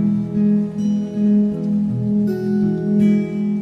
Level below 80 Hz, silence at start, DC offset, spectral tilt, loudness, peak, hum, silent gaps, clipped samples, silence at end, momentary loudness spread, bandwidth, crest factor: -52 dBFS; 0 s; under 0.1%; -10 dB/octave; -18 LUFS; -6 dBFS; none; none; under 0.1%; 0 s; 4 LU; 6.2 kHz; 10 dB